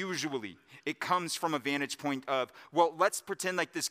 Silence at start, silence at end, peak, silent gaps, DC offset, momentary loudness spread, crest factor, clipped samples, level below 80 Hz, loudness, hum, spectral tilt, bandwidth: 0 s; 0 s; -12 dBFS; none; under 0.1%; 9 LU; 20 dB; under 0.1%; -84 dBFS; -32 LUFS; none; -3 dB/octave; 16 kHz